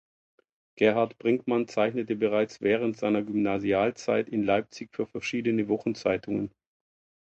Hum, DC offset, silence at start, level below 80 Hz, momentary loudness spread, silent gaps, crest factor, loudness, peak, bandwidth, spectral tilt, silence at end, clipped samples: none; under 0.1%; 0.75 s; -64 dBFS; 7 LU; none; 18 dB; -27 LUFS; -8 dBFS; 8.2 kHz; -6 dB/octave; 0.75 s; under 0.1%